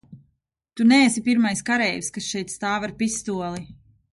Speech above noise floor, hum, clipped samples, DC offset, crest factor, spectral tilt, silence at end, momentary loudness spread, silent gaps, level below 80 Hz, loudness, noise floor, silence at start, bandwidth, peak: 50 dB; none; under 0.1%; under 0.1%; 18 dB; -3.5 dB/octave; 0.4 s; 12 LU; none; -58 dBFS; -22 LUFS; -72 dBFS; 0.1 s; 11.5 kHz; -6 dBFS